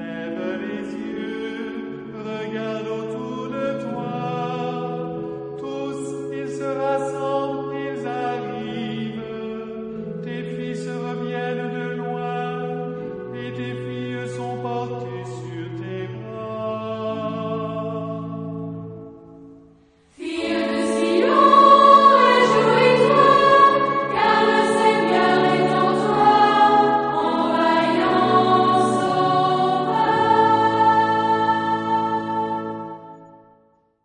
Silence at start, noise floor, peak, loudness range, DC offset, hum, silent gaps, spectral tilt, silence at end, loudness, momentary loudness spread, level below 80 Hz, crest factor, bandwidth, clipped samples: 0 s; -59 dBFS; -2 dBFS; 14 LU; under 0.1%; none; none; -5.5 dB/octave; 0.75 s; -20 LUFS; 16 LU; -60 dBFS; 18 dB; 10.5 kHz; under 0.1%